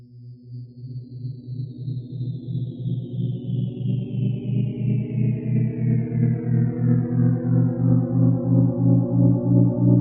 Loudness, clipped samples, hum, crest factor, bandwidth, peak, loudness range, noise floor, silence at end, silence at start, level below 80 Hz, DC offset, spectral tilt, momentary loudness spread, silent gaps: -22 LUFS; under 0.1%; none; 16 dB; 3.7 kHz; -4 dBFS; 10 LU; -42 dBFS; 0 s; 0 s; -52 dBFS; under 0.1%; -12 dB/octave; 15 LU; none